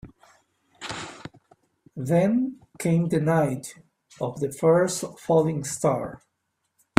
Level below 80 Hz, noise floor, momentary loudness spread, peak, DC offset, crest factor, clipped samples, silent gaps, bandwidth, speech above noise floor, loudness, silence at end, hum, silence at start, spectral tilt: -62 dBFS; -77 dBFS; 18 LU; 0 dBFS; under 0.1%; 26 dB; under 0.1%; none; 15.5 kHz; 53 dB; -25 LUFS; 0.8 s; none; 0.05 s; -6 dB/octave